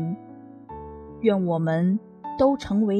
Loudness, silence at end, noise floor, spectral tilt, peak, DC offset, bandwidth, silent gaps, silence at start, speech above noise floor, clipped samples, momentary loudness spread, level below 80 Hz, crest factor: -24 LUFS; 0 s; -44 dBFS; -8.5 dB/octave; -6 dBFS; under 0.1%; 8.8 kHz; none; 0 s; 22 dB; under 0.1%; 19 LU; -52 dBFS; 18 dB